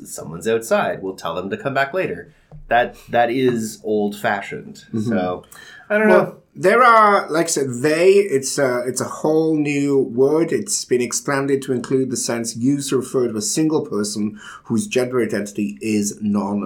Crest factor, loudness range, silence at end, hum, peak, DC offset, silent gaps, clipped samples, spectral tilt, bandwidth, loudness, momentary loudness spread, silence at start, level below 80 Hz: 16 dB; 6 LU; 0 s; none; -2 dBFS; under 0.1%; none; under 0.1%; -4.5 dB/octave; 18.5 kHz; -19 LUFS; 11 LU; 0 s; -56 dBFS